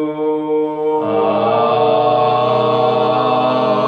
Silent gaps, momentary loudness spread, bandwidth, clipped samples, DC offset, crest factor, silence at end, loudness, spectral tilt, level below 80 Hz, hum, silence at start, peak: none; 4 LU; 6.4 kHz; under 0.1%; under 0.1%; 12 dB; 0 s; -15 LUFS; -8 dB/octave; -66 dBFS; none; 0 s; -2 dBFS